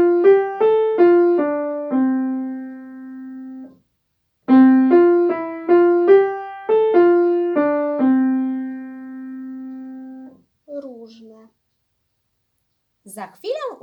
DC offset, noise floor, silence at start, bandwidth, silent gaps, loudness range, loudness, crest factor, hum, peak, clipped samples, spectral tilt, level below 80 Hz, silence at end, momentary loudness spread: under 0.1%; -71 dBFS; 0 s; 11.5 kHz; none; 20 LU; -16 LUFS; 16 dB; none; -2 dBFS; under 0.1%; -7 dB/octave; -76 dBFS; 0.1 s; 22 LU